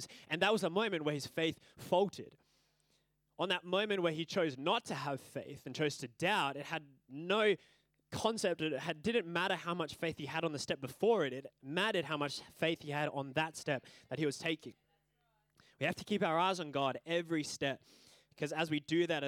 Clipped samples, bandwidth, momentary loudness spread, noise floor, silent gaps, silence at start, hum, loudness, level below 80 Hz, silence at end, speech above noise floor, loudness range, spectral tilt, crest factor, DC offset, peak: under 0.1%; 17.5 kHz; 11 LU; -78 dBFS; none; 0 s; none; -36 LUFS; -78 dBFS; 0 s; 42 dB; 2 LU; -4.5 dB/octave; 20 dB; under 0.1%; -18 dBFS